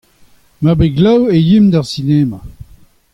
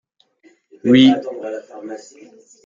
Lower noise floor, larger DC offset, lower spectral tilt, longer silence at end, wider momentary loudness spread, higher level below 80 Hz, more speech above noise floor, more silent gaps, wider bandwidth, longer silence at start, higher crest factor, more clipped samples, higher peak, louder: second, -47 dBFS vs -55 dBFS; neither; first, -8 dB/octave vs -6 dB/octave; second, 0.5 s vs 0.7 s; second, 8 LU vs 22 LU; first, -34 dBFS vs -62 dBFS; about the same, 36 dB vs 38 dB; neither; first, 11 kHz vs 7.4 kHz; second, 0.6 s vs 0.85 s; second, 12 dB vs 18 dB; neither; about the same, -2 dBFS vs -2 dBFS; first, -12 LUFS vs -15 LUFS